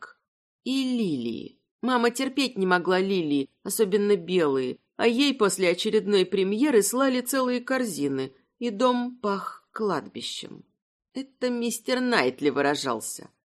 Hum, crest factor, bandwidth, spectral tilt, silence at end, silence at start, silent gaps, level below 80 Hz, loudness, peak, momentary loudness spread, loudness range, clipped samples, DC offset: none; 18 dB; 13.5 kHz; -4 dB/octave; 0.35 s; 0 s; 0.28-0.59 s, 1.71-1.79 s, 10.82-11.00 s; -76 dBFS; -25 LUFS; -6 dBFS; 12 LU; 6 LU; under 0.1%; under 0.1%